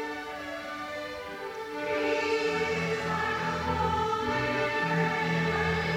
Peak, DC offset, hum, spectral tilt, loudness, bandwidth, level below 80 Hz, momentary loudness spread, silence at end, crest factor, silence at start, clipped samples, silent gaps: -14 dBFS; under 0.1%; none; -5.5 dB/octave; -29 LUFS; 16.5 kHz; -52 dBFS; 10 LU; 0 s; 16 dB; 0 s; under 0.1%; none